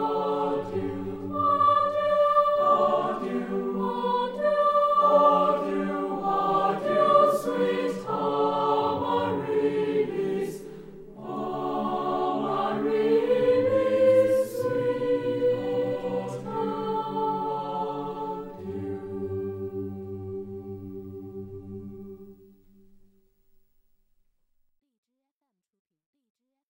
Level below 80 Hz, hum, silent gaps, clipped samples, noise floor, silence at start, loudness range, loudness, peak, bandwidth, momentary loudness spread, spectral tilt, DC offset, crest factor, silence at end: -60 dBFS; none; none; under 0.1%; -84 dBFS; 0 s; 13 LU; -25 LUFS; -8 dBFS; 16.5 kHz; 17 LU; -7 dB/octave; under 0.1%; 18 dB; 4.35 s